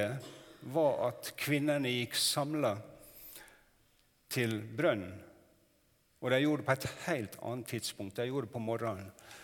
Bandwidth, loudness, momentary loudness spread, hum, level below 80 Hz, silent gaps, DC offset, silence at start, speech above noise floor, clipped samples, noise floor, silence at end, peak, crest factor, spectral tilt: 19 kHz; -34 LUFS; 19 LU; none; -72 dBFS; none; under 0.1%; 0 s; 36 dB; under 0.1%; -71 dBFS; 0 s; -14 dBFS; 22 dB; -4.5 dB/octave